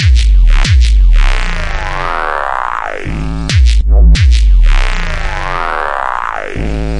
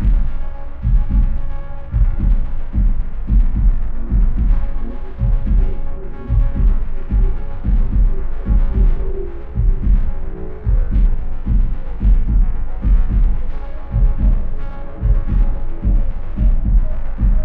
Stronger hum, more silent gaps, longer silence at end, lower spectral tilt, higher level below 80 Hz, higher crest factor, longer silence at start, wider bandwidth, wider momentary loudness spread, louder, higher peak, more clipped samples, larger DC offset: neither; neither; about the same, 0 s vs 0 s; second, -5 dB/octave vs -11 dB/octave; about the same, -10 dBFS vs -14 dBFS; about the same, 8 dB vs 12 dB; about the same, 0 s vs 0 s; first, 10 kHz vs 2.8 kHz; about the same, 9 LU vs 10 LU; first, -13 LUFS vs -21 LUFS; about the same, 0 dBFS vs -2 dBFS; neither; neither